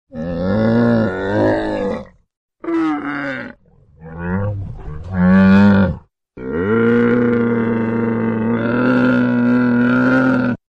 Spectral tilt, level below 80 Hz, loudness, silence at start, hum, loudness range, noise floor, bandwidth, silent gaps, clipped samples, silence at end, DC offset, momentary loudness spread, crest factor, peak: -9 dB/octave; -40 dBFS; -16 LUFS; 0.15 s; none; 8 LU; -48 dBFS; 6 kHz; 2.37-2.49 s; under 0.1%; 0.15 s; under 0.1%; 16 LU; 14 dB; -2 dBFS